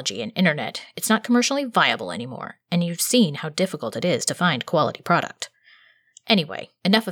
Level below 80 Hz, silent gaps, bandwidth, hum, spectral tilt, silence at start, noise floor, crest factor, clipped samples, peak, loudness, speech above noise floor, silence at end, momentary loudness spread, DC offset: -74 dBFS; none; 19.5 kHz; none; -4 dB/octave; 0 s; -55 dBFS; 20 dB; under 0.1%; -4 dBFS; -22 LUFS; 33 dB; 0 s; 12 LU; under 0.1%